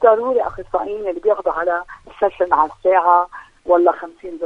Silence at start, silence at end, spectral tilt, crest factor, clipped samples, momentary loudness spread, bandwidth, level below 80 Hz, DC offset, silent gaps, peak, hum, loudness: 0 s; 0 s; -6.5 dB/octave; 16 dB; under 0.1%; 13 LU; 5.6 kHz; -48 dBFS; under 0.1%; none; 0 dBFS; none; -18 LUFS